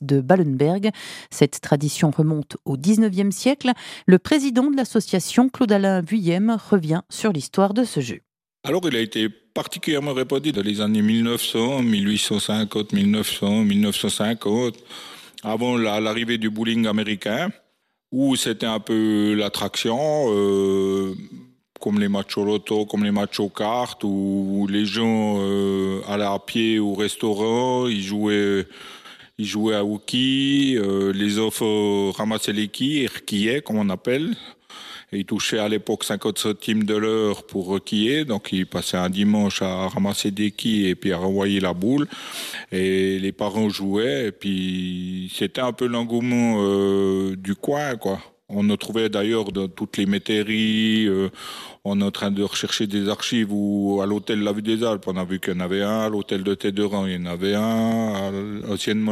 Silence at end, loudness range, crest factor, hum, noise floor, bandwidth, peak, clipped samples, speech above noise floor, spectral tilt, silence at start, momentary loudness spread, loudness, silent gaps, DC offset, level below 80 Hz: 0 s; 4 LU; 22 dB; none; -69 dBFS; 14.5 kHz; 0 dBFS; under 0.1%; 47 dB; -5 dB/octave; 0 s; 8 LU; -22 LUFS; none; under 0.1%; -62 dBFS